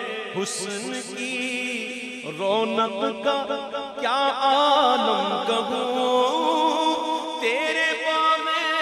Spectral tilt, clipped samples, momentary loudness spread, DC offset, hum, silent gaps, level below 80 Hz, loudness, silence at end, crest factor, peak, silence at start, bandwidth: -2.5 dB/octave; under 0.1%; 9 LU; under 0.1%; none; none; -72 dBFS; -23 LUFS; 0 s; 16 dB; -8 dBFS; 0 s; 14.5 kHz